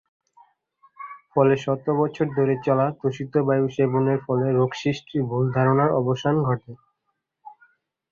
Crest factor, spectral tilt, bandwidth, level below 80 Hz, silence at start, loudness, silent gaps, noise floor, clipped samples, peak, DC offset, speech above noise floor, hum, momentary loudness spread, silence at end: 18 dB; -8 dB/octave; 7.2 kHz; -60 dBFS; 1 s; -22 LUFS; none; -77 dBFS; under 0.1%; -4 dBFS; under 0.1%; 56 dB; none; 7 LU; 0.65 s